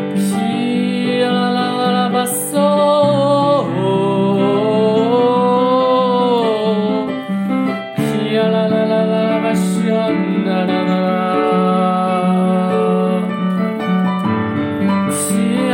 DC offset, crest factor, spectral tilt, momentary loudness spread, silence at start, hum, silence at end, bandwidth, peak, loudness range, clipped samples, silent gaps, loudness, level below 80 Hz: under 0.1%; 12 dB; -6 dB/octave; 5 LU; 0 s; none; 0 s; 16.5 kHz; -4 dBFS; 2 LU; under 0.1%; none; -15 LUFS; -62 dBFS